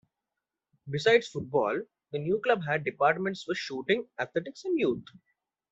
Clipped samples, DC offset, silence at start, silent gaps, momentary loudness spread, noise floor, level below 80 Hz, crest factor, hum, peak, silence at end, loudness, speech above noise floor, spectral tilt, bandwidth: under 0.1%; under 0.1%; 0.85 s; none; 11 LU; -88 dBFS; -70 dBFS; 22 dB; none; -8 dBFS; 0.7 s; -29 LUFS; 59 dB; -5.5 dB/octave; 8 kHz